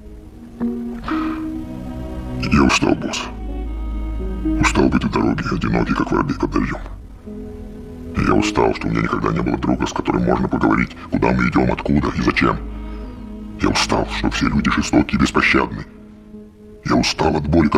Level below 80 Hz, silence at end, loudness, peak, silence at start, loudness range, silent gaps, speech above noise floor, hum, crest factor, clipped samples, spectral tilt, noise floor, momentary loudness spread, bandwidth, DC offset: -30 dBFS; 0 s; -19 LUFS; 0 dBFS; 0 s; 3 LU; none; 22 dB; none; 18 dB; under 0.1%; -5.5 dB/octave; -39 dBFS; 17 LU; 13 kHz; under 0.1%